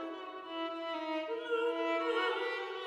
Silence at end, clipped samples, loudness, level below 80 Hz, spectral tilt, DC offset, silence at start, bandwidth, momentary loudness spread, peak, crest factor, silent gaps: 0 s; under 0.1%; -36 LUFS; -86 dBFS; -2.5 dB/octave; under 0.1%; 0 s; 10 kHz; 9 LU; -22 dBFS; 14 dB; none